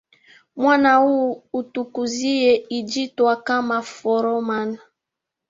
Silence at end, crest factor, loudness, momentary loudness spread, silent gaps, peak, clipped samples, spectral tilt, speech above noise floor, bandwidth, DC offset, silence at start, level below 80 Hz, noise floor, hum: 0.7 s; 18 dB; -20 LUFS; 12 LU; none; -4 dBFS; under 0.1%; -3.5 dB/octave; 64 dB; 7.8 kHz; under 0.1%; 0.55 s; -66 dBFS; -84 dBFS; none